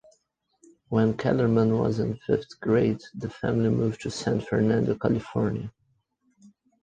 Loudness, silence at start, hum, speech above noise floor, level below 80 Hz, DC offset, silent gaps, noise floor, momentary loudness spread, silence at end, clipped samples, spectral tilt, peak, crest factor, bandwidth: -26 LUFS; 0.9 s; none; 47 dB; -54 dBFS; under 0.1%; none; -72 dBFS; 8 LU; 1.15 s; under 0.1%; -7.5 dB/octave; -8 dBFS; 18 dB; 9.4 kHz